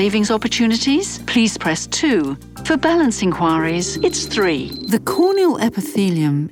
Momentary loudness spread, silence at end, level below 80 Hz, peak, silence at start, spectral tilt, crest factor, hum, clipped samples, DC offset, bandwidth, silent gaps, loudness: 5 LU; 0 s; -44 dBFS; -2 dBFS; 0 s; -4.5 dB/octave; 14 dB; none; under 0.1%; under 0.1%; 18 kHz; none; -17 LUFS